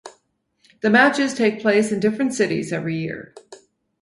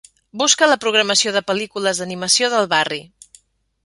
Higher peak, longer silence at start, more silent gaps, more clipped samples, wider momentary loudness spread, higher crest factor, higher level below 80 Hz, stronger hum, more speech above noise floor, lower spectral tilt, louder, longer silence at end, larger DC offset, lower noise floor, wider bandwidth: about the same, -2 dBFS vs 0 dBFS; second, 0.05 s vs 0.35 s; neither; neither; first, 12 LU vs 9 LU; about the same, 20 dB vs 20 dB; about the same, -62 dBFS vs -64 dBFS; neither; first, 47 dB vs 35 dB; first, -5 dB/octave vs -1 dB/octave; second, -19 LUFS vs -16 LUFS; second, 0.45 s vs 0.8 s; neither; first, -67 dBFS vs -53 dBFS; about the same, 11.5 kHz vs 11.5 kHz